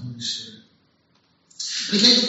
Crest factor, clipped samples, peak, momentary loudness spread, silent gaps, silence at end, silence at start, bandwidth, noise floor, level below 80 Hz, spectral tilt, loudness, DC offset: 22 dB; under 0.1%; -2 dBFS; 17 LU; none; 0 s; 0 s; 8 kHz; -63 dBFS; -72 dBFS; -2 dB/octave; -21 LUFS; under 0.1%